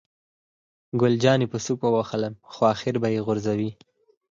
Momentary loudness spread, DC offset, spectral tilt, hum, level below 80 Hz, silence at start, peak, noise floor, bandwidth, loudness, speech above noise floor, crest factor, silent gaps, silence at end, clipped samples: 9 LU; under 0.1%; -6 dB/octave; none; -62 dBFS; 0.95 s; -6 dBFS; under -90 dBFS; 7.6 kHz; -24 LUFS; over 67 dB; 20 dB; none; 0.55 s; under 0.1%